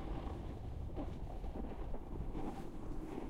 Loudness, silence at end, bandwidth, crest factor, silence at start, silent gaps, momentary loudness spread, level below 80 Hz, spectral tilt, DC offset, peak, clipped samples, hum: -47 LUFS; 0 s; 11 kHz; 12 dB; 0 s; none; 3 LU; -46 dBFS; -8 dB/octave; 0.1%; -30 dBFS; under 0.1%; none